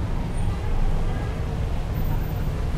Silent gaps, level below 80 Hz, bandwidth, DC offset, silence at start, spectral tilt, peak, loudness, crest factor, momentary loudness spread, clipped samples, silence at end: none; -26 dBFS; 14.5 kHz; under 0.1%; 0 s; -7.5 dB/octave; -12 dBFS; -28 LUFS; 12 dB; 1 LU; under 0.1%; 0 s